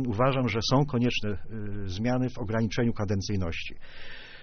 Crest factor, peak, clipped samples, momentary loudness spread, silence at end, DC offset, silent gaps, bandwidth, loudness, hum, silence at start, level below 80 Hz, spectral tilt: 18 dB; -10 dBFS; under 0.1%; 16 LU; 0 s; under 0.1%; none; 6.6 kHz; -28 LUFS; none; 0 s; -42 dBFS; -5.5 dB/octave